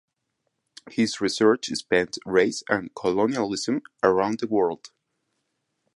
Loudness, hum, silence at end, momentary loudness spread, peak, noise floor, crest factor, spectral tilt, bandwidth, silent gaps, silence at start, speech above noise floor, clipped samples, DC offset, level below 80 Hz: -24 LUFS; none; 1.1 s; 6 LU; -4 dBFS; -78 dBFS; 20 dB; -4 dB/octave; 11.5 kHz; none; 0.85 s; 54 dB; under 0.1%; under 0.1%; -62 dBFS